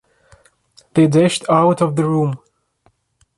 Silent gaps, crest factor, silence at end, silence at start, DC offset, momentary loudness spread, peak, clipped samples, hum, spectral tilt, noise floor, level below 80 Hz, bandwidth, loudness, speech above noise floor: none; 16 dB; 1 s; 0.95 s; under 0.1%; 9 LU; -2 dBFS; under 0.1%; none; -6.5 dB/octave; -61 dBFS; -58 dBFS; 11.5 kHz; -16 LUFS; 46 dB